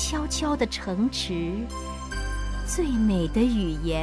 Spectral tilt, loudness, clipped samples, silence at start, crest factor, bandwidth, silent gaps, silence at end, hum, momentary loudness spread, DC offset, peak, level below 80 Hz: -4.5 dB/octave; -27 LUFS; under 0.1%; 0 s; 14 dB; 11 kHz; none; 0 s; none; 9 LU; under 0.1%; -10 dBFS; -32 dBFS